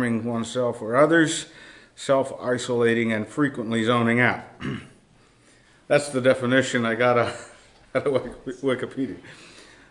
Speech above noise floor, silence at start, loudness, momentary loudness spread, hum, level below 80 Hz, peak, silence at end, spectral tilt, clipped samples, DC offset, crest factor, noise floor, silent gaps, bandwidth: 34 dB; 0 s; -23 LUFS; 14 LU; none; -60 dBFS; -4 dBFS; 0.25 s; -5 dB/octave; under 0.1%; under 0.1%; 20 dB; -56 dBFS; none; 11 kHz